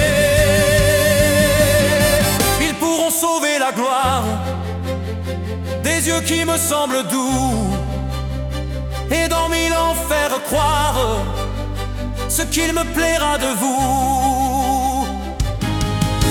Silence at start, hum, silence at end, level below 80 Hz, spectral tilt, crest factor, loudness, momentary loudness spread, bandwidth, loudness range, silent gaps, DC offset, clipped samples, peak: 0 s; none; 0 s; -28 dBFS; -4 dB/octave; 16 dB; -17 LUFS; 11 LU; 18 kHz; 5 LU; none; under 0.1%; under 0.1%; 0 dBFS